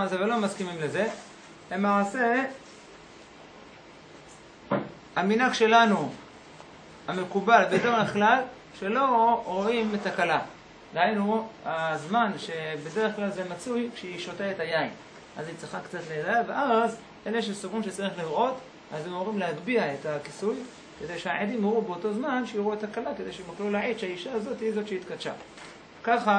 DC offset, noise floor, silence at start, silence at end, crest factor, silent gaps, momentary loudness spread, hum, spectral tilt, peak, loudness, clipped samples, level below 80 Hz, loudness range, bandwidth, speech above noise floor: under 0.1%; -49 dBFS; 0 s; 0 s; 22 dB; none; 21 LU; none; -5 dB/octave; -6 dBFS; -28 LUFS; under 0.1%; -66 dBFS; 7 LU; 10.5 kHz; 22 dB